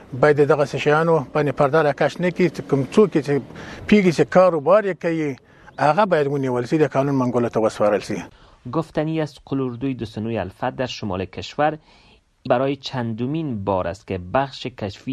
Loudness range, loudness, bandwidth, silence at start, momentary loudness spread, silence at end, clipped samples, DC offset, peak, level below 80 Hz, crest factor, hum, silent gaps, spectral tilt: 7 LU; -20 LUFS; 12 kHz; 0 s; 12 LU; 0 s; under 0.1%; under 0.1%; -2 dBFS; -54 dBFS; 20 dB; none; none; -7 dB/octave